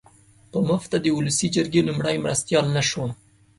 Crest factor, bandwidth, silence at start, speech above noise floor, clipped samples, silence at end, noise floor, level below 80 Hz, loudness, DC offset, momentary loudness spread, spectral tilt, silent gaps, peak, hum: 16 dB; 11.5 kHz; 0.55 s; 32 dB; under 0.1%; 0.45 s; -54 dBFS; -54 dBFS; -23 LUFS; under 0.1%; 9 LU; -4.5 dB/octave; none; -6 dBFS; none